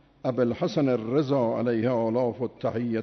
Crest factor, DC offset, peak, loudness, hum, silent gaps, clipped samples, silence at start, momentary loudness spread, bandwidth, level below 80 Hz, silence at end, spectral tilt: 14 dB; under 0.1%; -12 dBFS; -26 LUFS; none; none; under 0.1%; 0.25 s; 5 LU; 6.4 kHz; -64 dBFS; 0 s; -8 dB/octave